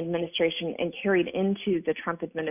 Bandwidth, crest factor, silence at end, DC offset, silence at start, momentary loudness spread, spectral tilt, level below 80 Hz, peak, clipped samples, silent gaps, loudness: 3.7 kHz; 14 dB; 0 s; under 0.1%; 0 s; 6 LU; -10 dB/octave; -62 dBFS; -12 dBFS; under 0.1%; none; -28 LUFS